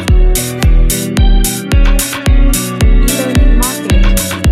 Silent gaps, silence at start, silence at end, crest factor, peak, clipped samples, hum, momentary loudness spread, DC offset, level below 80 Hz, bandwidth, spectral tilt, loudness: none; 0 s; 0 s; 8 dB; 0 dBFS; under 0.1%; none; 2 LU; under 0.1%; -10 dBFS; 16 kHz; -4.5 dB/octave; -12 LUFS